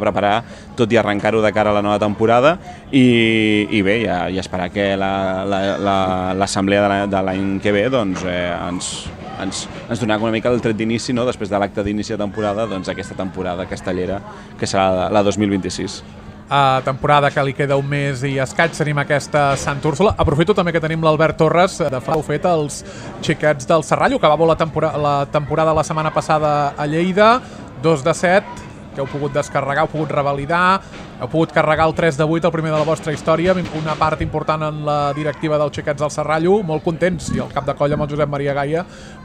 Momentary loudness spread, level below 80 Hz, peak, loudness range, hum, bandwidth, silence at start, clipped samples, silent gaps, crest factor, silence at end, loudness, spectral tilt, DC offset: 10 LU; -42 dBFS; 0 dBFS; 4 LU; none; 12.5 kHz; 0 s; under 0.1%; none; 18 dB; 0 s; -18 LUFS; -5.5 dB/octave; under 0.1%